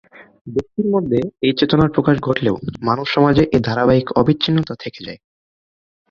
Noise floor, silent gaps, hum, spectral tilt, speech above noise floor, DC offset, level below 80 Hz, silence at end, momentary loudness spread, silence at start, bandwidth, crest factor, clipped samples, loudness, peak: under -90 dBFS; 0.41-0.45 s; none; -8 dB/octave; over 73 dB; under 0.1%; -44 dBFS; 0.95 s; 11 LU; 0.15 s; 7.2 kHz; 16 dB; under 0.1%; -17 LUFS; -2 dBFS